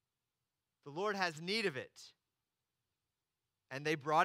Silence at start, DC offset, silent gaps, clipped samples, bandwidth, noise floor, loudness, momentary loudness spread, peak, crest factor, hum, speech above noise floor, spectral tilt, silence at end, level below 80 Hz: 0.85 s; under 0.1%; none; under 0.1%; 16 kHz; under -90 dBFS; -38 LUFS; 21 LU; -18 dBFS; 24 dB; none; over 53 dB; -4 dB/octave; 0 s; under -90 dBFS